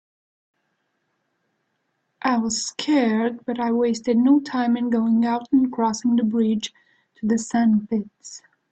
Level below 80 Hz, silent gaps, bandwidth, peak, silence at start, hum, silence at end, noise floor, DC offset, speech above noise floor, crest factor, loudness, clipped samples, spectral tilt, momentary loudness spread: -64 dBFS; none; 8.8 kHz; -8 dBFS; 2.25 s; none; 0.35 s; -73 dBFS; under 0.1%; 53 dB; 14 dB; -21 LUFS; under 0.1%; -5 dB/octave; 8 LU